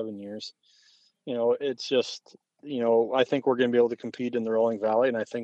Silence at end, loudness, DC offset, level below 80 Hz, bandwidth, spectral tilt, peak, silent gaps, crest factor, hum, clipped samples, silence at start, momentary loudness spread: 0 s; -26 LUFS; under 0.1%; -82 dBFS; 8.2 kHz; -5.5 dB/octave; -8 dBFS; none; 18 dB; none; under 0.1%; 0 s; 15 LU